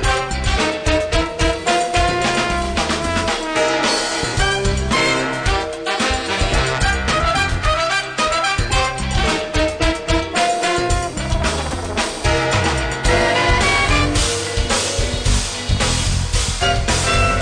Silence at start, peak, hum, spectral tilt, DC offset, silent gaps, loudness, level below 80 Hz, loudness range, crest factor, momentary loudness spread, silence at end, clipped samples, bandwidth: 0 s; -4 dBFS; none; -3.5 dB/octave; under 0.1%; none; -18 LUFS; -24 dBFS; 2 LU; 14 dB; 4 LU; 0 s; under 0.1%; 10.5 kHz